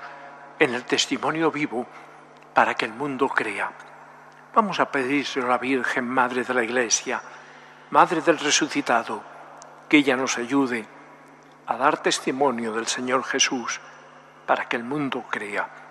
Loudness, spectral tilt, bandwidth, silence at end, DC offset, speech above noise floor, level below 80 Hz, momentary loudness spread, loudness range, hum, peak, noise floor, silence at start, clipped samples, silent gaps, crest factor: -23 LUFS; -2.5 dB/octave; 13 kHz; 0 s; under 0.1%; 26 dB; -76 dBFS; 14 LU; 3 LU; none; -2 dBFS; -49 dBFS; 0 s; under 0.1%; none; 22 dB